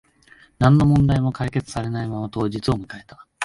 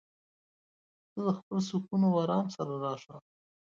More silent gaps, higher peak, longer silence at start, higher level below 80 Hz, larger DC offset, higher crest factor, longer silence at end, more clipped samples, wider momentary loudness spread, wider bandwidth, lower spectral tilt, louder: second, none vs 1.43-1.51 s; first, -2 dBFS vs -16 dBFS; second, 0.6 s vs 1.15 s; first, -40 dBFS vs -76 dBFS; neither; about the same, 18 dB vs 16 dB; second, 0 s vs 0.6 s; neither; about the same, 12 LU vs 14 LU; first, 11.5 kHz vs 7.4 kHz; about the same, -7.5 dB/octave vs -7.5 dB/octave; first, -21 LUFS vs -32 LUFS